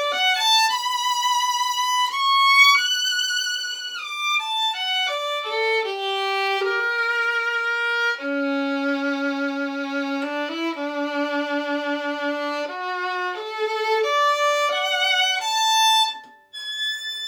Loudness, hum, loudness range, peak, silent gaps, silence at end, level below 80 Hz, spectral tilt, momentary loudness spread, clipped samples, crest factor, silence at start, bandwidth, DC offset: -21 LUFS; none; 7 LU; -4 dBFS; none; 0 s; -84 dBFS; 1.5 dB/octave; 10 LU; under 0.1%; 18 dB; 0 s; over 20 kHz; under 0.1%